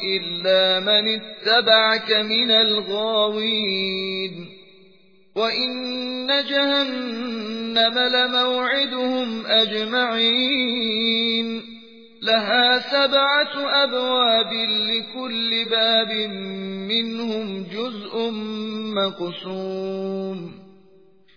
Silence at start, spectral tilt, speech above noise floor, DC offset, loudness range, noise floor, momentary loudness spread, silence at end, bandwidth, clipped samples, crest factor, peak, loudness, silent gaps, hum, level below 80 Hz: 0 s; -5 dB/octave; 34 dB; 0.2%; 8 LU; -55 dBFS; 12 LU; 0.7 s; 5.2 kHz; under 0.1%; 18 dB; -4 dBFS; -20 LUFS; none; none; -72 dBFS